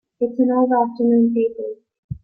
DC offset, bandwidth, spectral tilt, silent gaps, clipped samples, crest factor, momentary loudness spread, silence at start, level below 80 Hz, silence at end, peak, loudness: under 0.1%; 4.4 kHz; -12 dB/octave; 1.98-2.09 s; under 0.1%; 14 dB; 15 LU; 0.2 s; -52 dBFS; 0.1 s; -6 dBFS; -18 LUFS